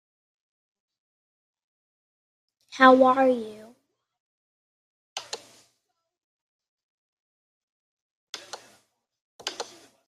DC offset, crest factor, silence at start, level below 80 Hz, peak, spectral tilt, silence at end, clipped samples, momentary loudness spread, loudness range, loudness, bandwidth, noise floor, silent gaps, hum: under 0.1%; 26 dB; 2.75 s; -80 dBFS; -2 dBFS; -3 dB/octave; 0.45 s; under 0.1%; 26 LU; 21 LU; -20 LUFS; 12.5 kHz; -77 dBFS; 4.20-5.16 s, 6.24-6.59 s, 6.68-8.33 s, 9.21-9.39 s; none